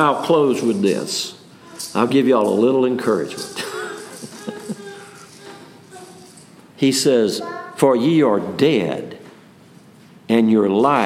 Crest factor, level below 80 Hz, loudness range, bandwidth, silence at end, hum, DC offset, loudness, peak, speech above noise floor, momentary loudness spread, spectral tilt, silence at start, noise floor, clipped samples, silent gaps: 18 dB; -72 dBFS; 10 LU; 16 kHz; 0 s; none; under 0.1%; -18 LUFS; -2 dBFS; 29 dB; 21 LU; -5 dB/octave; 0 s; -46 dBFS; under 0.1%; none